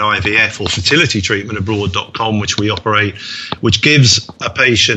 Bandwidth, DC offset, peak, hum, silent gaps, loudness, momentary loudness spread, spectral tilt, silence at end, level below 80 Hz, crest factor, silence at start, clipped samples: 8.4 kHz; under 0.1%; 0 dBFS; none; none; -13 LUFS; 9 LU; -3.5 dB/octave; 0 s; -40 dBFS; 14 dB; 0 s; under 0.1%